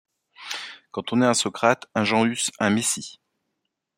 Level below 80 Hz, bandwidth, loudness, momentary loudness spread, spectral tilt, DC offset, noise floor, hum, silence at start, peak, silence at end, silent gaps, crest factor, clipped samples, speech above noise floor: -66 dBFS; 16 kHz; -23 LUFS; 13 LU; -3.5 dB/octave; under 0.1%; -79 dBFS; none; 0.4 s; -4 dBFS; 0.85 s; none; 22 dB; under 0.1%; 57 dB